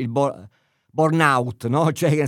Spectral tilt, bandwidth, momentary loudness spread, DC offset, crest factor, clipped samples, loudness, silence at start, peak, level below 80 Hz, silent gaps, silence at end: -6.5 dB/octave; 15.5 kHz; 10 LU; under 0.1%; 20 dB; under 0.1%; -20 LUFS; 0 s; -2 dBFS; -68 dBFS; none; 0 s